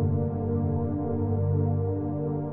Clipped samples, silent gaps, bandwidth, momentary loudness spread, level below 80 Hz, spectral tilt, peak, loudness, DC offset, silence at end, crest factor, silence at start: under 0.1%; none; 2 kHz; 4 LU; -48 dBFS; -15 dB/octave; -14 dBFS; -28 LUFS; under 0.1%; 0 s; 12 dB; 0 s